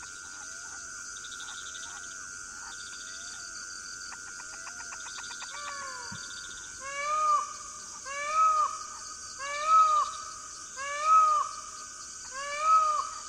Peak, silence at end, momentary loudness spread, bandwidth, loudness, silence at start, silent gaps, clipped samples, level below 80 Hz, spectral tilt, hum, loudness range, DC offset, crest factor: -14 dBFS; 0 s; 16 LU; 13 kHz; -30 LUFS; 0 s; none; under 0.1%; -66 dBFS; 0.5 dB/octave; none; 12 LU; under 0.1%; 18 dB